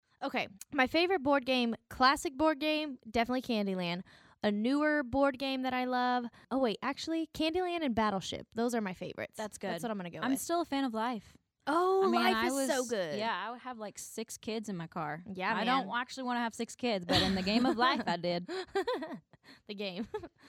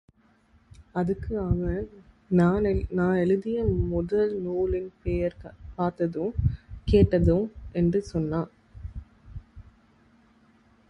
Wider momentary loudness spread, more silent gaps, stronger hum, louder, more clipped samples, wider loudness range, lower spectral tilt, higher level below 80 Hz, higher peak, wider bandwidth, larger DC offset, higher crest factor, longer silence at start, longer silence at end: second, 12 LU vs 20 LU; neither; neither; second, -33 LUFS vs -26 LUFS; neither; about the same, 5 LU vs 3 LU; second, -4 dB/octave vs -9.5 dB/octave; second, -62 dBFS vs -38 dBFS; second, -14 dBFS vs -8 dBFS; first, 16 kHz vs 8.4 kHz; neither; about the same, 20 dB vs 18 dB; second, 0.2 s vs 0.8 s; second, 0.2 s vs 1.3 s